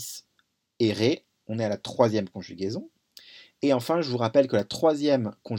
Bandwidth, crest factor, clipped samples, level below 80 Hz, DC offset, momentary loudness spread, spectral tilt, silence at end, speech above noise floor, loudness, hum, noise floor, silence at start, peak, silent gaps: 17.5 kHz; 22 dB; under 0.1%; -70 dBFS; under 0.1%; 12 LU; -6 dB/octave; 0 s; 47 dB; -26 LUFS; none; -72 dBFS; 0 s; -6 dBFS; none